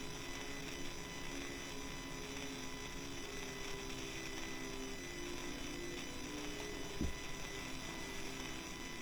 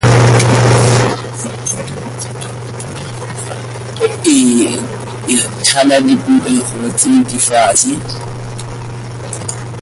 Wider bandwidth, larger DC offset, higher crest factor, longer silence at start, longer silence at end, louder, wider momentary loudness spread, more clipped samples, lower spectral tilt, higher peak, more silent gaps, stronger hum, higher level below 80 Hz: first, over 20 kHz vs 11.5 kHz; neither; about the same, 18 dB vs 14 dB; about the same, 0 s vs 0 s; about the same, 0 s vs 0 s; second, -45 LUFS vs -12 LUFS; second, 2 LU vs 15 LU; neither; second, -3 dB/octave vs -4.5 dB/octave; second, -26 dBFS vs 0 dBFS; neither; neither; second, -52 dBFS vs -38 dBFS